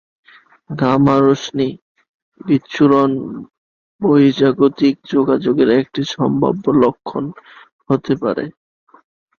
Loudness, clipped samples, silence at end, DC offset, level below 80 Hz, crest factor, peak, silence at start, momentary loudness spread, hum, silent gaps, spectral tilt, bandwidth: -16 LUFS; under 0.1%; 0.9 s; under 0.1%; -54 dBFS; 16 dB; -2 dBFS; 0.7 s; 12 LU; none; 1.82-1.95 s, 2.08-2.32 s, 3.58-3.99 s, 7.72-7.79 s; -7.5 dB/octave; 7 kHz